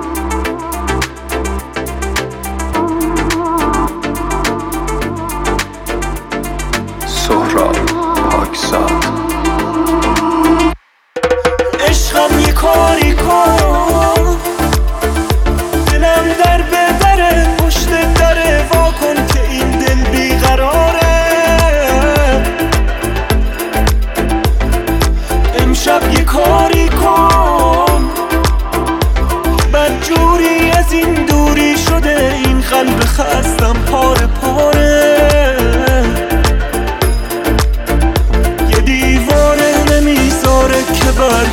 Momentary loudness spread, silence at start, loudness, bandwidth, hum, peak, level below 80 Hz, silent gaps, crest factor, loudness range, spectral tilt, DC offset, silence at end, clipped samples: 8 LU; 0 s; -12 LUFS; 17.5 kHz; none; 0 dBFS; -16 dBFS; none; 12 dB; 5 LU; -5 dB/octave; under 0.1%; 0 s; under 0.1%